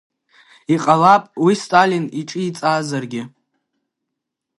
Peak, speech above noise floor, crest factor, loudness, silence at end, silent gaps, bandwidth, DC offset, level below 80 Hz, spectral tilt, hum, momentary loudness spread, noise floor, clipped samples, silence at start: 0 dBFS; 63 dB; 18 dB; -17 LUFS; 1.3 s; none; 11.5 kHz; under 0.1%; -68 dBFS; -5.5 dB/octave; none; 16 LU; -80 dBFS; under 0.1%; 0.7 s